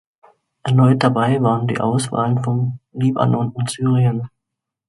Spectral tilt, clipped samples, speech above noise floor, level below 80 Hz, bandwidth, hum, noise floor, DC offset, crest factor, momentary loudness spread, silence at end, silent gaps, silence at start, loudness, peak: -7 dB/octave; under 0.1%; 65 dB; -56 dBFS; 11.5 kHz; none; -82 dBFS; under 0.1%; 18 dB; 9 LU; 0.6 s; none; 0.65 s; -18 LUFS; 0 dBFS